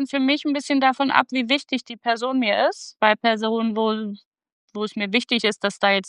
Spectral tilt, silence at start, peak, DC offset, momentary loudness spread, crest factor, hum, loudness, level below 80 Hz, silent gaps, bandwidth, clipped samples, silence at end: -4 dB/octave; 0 s; 0 dBFS; under 0.1%; 9 LU; 22 dB; none; -21 LUFS; -76 dBFS; 4.26-4.32 s, 4.52-4.68 s; 11 kHz; under 0.1%; 0 s